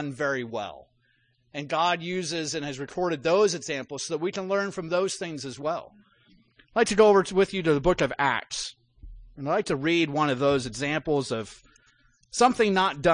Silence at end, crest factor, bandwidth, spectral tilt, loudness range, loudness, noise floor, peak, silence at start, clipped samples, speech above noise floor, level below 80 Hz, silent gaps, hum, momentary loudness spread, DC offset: 0 s; 20 dB; 10.5 kHz; -4.5 dB/octave; 5 LU; -26 LUFS; -68 dBFS; -8 dBFS; 0 s; under 0.1%; 42 dB; -52 dBFS; none; none; 12 LU; under 0.1%